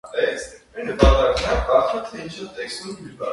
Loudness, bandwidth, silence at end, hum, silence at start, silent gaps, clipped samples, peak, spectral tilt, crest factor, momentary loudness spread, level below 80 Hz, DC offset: -21 LUFS; 11.5 kHz; 0 s; none; 0.05 s; none; under 0.1%; 0 dBFS; -5.5 dB/octave; 20 dB; 17 LU; -28 dBFS; under 0.1%